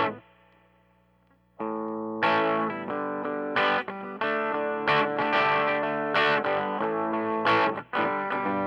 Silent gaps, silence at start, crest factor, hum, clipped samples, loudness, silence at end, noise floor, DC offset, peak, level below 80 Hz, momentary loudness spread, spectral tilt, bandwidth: none; 0 s; 18 dB; 60 Hz at -65 dBFS; under 0.1%; -26 LUFS; 0 s; -64 dBFS; under 0.1%; -10 dBFS; -70 dBFS; 9 LU; -6 dB/octave; 9.2 kHz